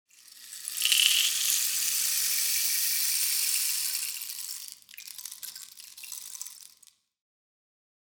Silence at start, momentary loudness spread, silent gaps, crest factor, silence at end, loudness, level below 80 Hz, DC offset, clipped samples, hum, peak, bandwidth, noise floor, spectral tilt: 0.35 s; 20 LU; none; 26 dB; 1.35 s; -25 LUFS; -84 dBFS; under 0.1%; under 0.1%; none; -4 dBFS; over 20 kHz; -61 dBFS; 5.5 dB/octave